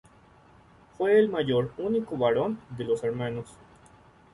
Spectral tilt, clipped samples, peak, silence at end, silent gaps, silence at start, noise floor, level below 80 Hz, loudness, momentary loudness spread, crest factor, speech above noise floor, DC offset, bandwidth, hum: -7 dB/octave; under 0.1%; -12 dBFS; 0.8 s; none; 1 s; -56 dBFS; -60 dBFS; -27 LUFS; 12 LU; 18 dB; 30 dB; under 0.1%; 11 kHz; none